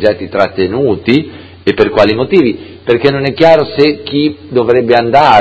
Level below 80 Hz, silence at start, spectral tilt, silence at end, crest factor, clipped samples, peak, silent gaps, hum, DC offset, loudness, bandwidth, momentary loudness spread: -40 dBFS; 0 s; -7 dB/octave; 0 s; 10 dB; 1%; 0 dBFS; none; none; under 0.1%; -11 LUFS; 8 kHz; 7 LU